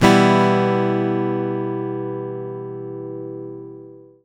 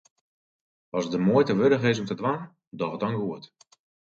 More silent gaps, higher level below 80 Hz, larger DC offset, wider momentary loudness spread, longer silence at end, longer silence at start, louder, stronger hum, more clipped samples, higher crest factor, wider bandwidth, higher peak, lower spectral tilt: second, none vs 2.67-2.71 s; first, -54 dBFS vs -66 dBFS; neither; first, 19 LU vs 13 LU; second, 0.25 s vs 0.65 s; second, 0 s vs 0.95 s; first, -20 LUFS vs -26 LUFS; neither; neither; about the same, 20 dB vs 18 dB; first, 16.5 kHz vs 7.6 kHz; first, 0 dBFS vs -8 dBFS; about the same, -6.5 dB/octave vs -7 dB/octave